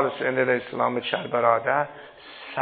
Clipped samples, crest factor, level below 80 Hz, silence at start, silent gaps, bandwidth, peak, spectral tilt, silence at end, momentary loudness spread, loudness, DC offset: under 0.1%; 20 dB; -70 dBFS; 0 s; none; 4.8 kHz; -4 dBFS; -9.5 dB/octave; 0 s; 18 LU; -24 LUFS; under 0.1%